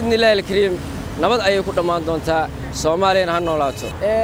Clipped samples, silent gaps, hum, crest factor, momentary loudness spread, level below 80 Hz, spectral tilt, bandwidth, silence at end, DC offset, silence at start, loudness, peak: under 0.1%; none; none; 14 dB; 8 LU; -36 dBFS; -4.5 dB/octave; over 20 kHz; 0 s; under 0.1%; 0 s; -18 LUFS; -4 dBFS